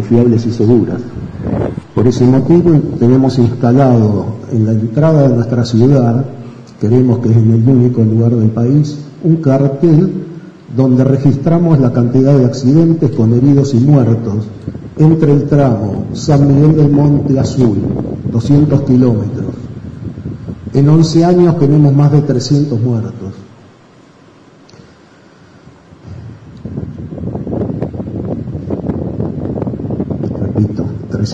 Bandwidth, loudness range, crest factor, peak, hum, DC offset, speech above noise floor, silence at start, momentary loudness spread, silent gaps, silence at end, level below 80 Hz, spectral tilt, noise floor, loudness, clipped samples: 8 kHz; 11 LU; 10 dB; 0 dBFS; none; under 0.1%; 33 dB; 0 s; 15 LU; none; 0 s; -38 dBFS; -9 dB/octave; -42 dBFS; -11 LUFS; under 0.1%